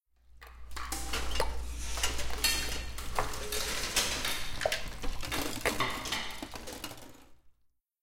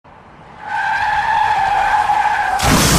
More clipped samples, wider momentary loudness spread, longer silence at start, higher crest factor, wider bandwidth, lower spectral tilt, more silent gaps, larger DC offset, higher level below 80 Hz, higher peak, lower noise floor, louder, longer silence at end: neither; first, 14 LU vs 7 LU; about the same, 0.3 s vs 0.4 s; first, 22 dB vs 16 dB; about the same, 17 kHz vs 15.5 kHz; about the same, -2 dB/octave vs -3 dB/octave; neither; neither; second, -42 dBFS vs -32 dBFS; second, -12 dBFS vs 0 dBFS; first, -71 dBFS vs -40 dBFS; second, -34 LUFS vs -15 LUFS; first, 0.5 s vs 0 s